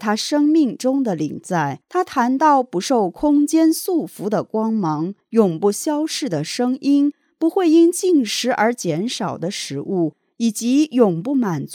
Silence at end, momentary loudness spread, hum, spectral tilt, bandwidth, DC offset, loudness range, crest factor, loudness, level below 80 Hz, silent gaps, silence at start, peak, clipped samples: 0 s; 8 LU; none; -5 dB/octave; 18.5 kHz; under 0.1%; 2 LU; 16 dB; -19 LUFS; -62 dBFS; none; 0 s; -2 dBFS; under 0.1%